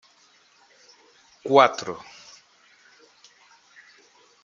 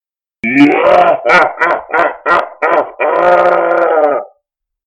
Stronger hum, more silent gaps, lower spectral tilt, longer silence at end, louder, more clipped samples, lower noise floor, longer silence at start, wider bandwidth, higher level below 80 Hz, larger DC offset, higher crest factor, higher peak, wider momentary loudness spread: first, 60 Hz at -70 dBFS vs none; neither; second, -4 dB/octave vs -5.5 dB/octave; first, 2.45 s vs 0.6 s; second, -20 LUFS vs -10 LUFS; neither; second, -59 dBFS vs -68 dBFS; first, 1.45 s vs 0.45 s; second, 7.6 kHz vs 9.6 kHz; second, -76 dBFS vs -52 dBFS; neither; first, 26 dB vs 12 dB; about the same, -2 dBFS vs 0 dBFS; first, 27 LU vs 6 LU